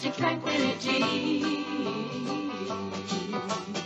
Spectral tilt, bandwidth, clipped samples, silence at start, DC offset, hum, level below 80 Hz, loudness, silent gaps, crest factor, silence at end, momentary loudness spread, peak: -4.5 dB/octave; 8.4 kHz; under 0.1%; 0 s; under 0.1%; none; -72 dBFS; -29 LUFS; none; 16 dB; 0 s; 7 LU; -14 dBFS